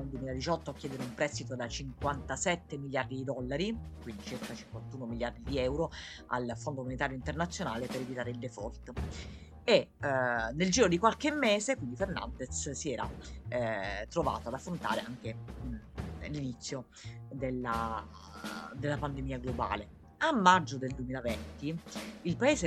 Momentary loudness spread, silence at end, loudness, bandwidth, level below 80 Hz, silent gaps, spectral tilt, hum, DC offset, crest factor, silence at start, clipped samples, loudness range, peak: 14 LU; 0 s; -34 LUFS; 15 kHz; -50 dBFS; none; -4.5 dB/octave; none; under 0.1%; 26 dB; 0 s; under 0.1%; 8 LU; -8 dBFS